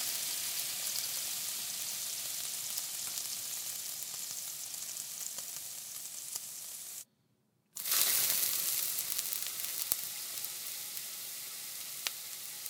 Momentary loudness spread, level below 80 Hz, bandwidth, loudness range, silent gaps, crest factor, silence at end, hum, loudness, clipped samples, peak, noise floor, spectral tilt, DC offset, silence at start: 12 LU; -88 dBFS; 19 kHz; 8 LU; none; 34 dB; 0 s; none; -35 LUFS; under 0.1%; -4 dBFS; -74 dBFS; 2 dB/octave; under 0.1%; 0 s